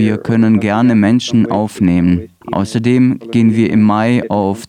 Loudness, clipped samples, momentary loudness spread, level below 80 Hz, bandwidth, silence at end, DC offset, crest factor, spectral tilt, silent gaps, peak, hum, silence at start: -13 LUFS; under 0.1%; 5 LU; -44 dBFS; 11 kHz; 0.05 s; under 0.1%; 10 dB; -7 dB/octave; none; -2 dBFS; none; 0 s